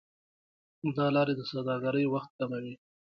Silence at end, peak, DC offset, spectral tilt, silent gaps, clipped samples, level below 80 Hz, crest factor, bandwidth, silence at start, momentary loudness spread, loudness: 0.4 s; -16 dBFS; under 0.1%; -8.5 dB/octave; 2.30-2.39 s; under 0.1%; -74 dBFS; 16 dB; 6.2 kHz; 0.85 s; 11 LU; -31 LUFS